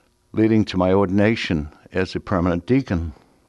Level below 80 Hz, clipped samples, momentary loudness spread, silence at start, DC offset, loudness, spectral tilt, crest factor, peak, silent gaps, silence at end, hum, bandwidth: -40 dBFS; under 0.1%; 8 LU; 0.35 s; under 0.1%; -21 LUFS; -7.5 dB/octave; 16 dB; -4 dBFS; none; 0.35 s; none; 10.5 kHz